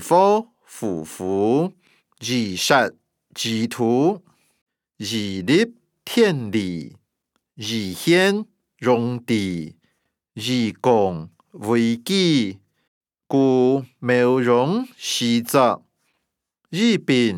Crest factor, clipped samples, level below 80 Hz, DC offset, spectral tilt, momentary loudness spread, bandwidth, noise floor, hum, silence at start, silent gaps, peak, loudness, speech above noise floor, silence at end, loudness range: 18 dB; under 0.1%; -70 dBFS; under 0.1%; -5 dB/octave; 14 LU; 18.5 kHz; -77 dBFS; none; 0 s; 4.61-4.66 s, 12.88-13.01 s; -2 dBFS; -20 LUFS; 57 dB; 0 s; 3 LU